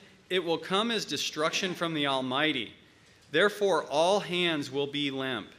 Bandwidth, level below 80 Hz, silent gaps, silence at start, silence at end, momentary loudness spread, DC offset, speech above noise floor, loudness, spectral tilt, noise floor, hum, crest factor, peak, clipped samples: 15.5 kHz; -74 dBFS; none; 0.3 s; 0.05 s; 6 LU; under 0.1%; 29 dB; -28 LUFS; -3.5 dB/octave; -58 dBFS; none; 18 dB; -12 dBFS; under 0.1%